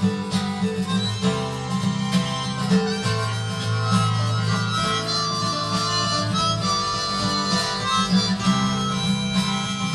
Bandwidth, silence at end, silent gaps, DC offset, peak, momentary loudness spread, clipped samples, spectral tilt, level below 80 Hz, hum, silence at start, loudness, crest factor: 12.5 kHz; 0 s; none; under 0.1%; -6 dBFS; 4 LU; under 0.1%; -4.5 dB/octave; -48 dBFS; none; 0 s; -22 LUFS; 16 dB